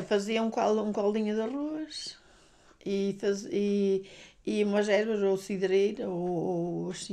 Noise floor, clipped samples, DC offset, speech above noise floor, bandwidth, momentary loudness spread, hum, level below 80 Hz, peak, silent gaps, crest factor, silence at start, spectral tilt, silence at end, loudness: -59 dBFS; under 0.1%; under 0.1%; 30 dB; 12 kHz; 9 LU; none; -66 dBFS; -14 dBFS; none; 16 dB; 0 s; -5.5 dB/octave; 0 s; -30 LUFS